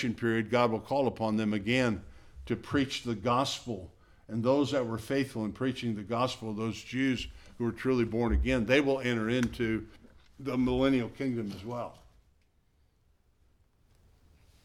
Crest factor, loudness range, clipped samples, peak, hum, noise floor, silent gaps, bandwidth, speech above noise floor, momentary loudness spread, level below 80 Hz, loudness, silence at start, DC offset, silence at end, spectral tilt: 20 dB; 4 LU; under 0.1%; -12 dBFS; none; -68 dBFS; none; 14 kHz; 38 dB; 11 LU; -46 dBFS; -31 LUFS; 0 s; under 0.1%; 2.65 s; -6 dB/octave